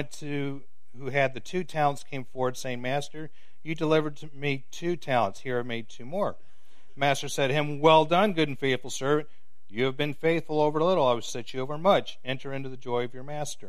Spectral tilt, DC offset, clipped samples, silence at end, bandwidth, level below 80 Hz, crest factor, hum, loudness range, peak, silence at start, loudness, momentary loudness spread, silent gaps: -5 dB/octave; 2%; under 0.1%; 0 s; 15 kHz; -66 dBFS; 22 dB; none; 5 LU; -4 dBFS; 0 s; -28 LUFS; 13 LU; none